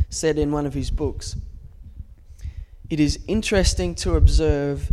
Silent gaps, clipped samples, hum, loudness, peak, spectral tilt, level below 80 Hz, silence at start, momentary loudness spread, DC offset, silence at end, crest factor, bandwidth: none; under 0.1%; none; -22 LUFS; -2 dBFS; -5.5 dB/octave; -26 dBFS; 0 s; 20 LU; under 0.1%; 0 s; 18 dB; 13 kHz